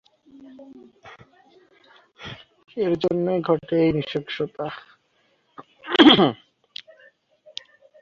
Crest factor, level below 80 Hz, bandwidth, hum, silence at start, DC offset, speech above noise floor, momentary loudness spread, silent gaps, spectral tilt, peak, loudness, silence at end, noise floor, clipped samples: 22 dB; -58 dBFS; 7.2 kHz; none; 0.6 s; under 0.1%; 45 dB; 26 LU; none; -6.5 dB/octave; -2 dBFS; -20 LUFS; 1.7 s; -66 dBFS; under 0.1%